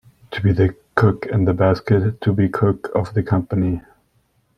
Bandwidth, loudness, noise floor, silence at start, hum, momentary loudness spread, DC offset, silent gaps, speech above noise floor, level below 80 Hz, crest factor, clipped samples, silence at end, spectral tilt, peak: 6 kHz; -19 LUFS; -63 dBFS; 0.3 s; none; 5 LU; under 0.1%; none; 45 dB; -46 dBFS; 18 dB; under 0.1%; 0.8 s; -9.5 dB/octave; -2 dBFS